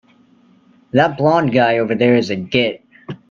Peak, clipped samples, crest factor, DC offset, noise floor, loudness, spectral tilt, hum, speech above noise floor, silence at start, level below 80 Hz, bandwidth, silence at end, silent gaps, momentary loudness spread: 0 dBFS; under 0.1%; 16 dB; under 0.1%; -51 dBFS; -16 LUFS; -7 dB/octave; none; 37 dB; 0.95 s; -56 dBFS; 7.4 kHz; 0.15 s; none; 16 LU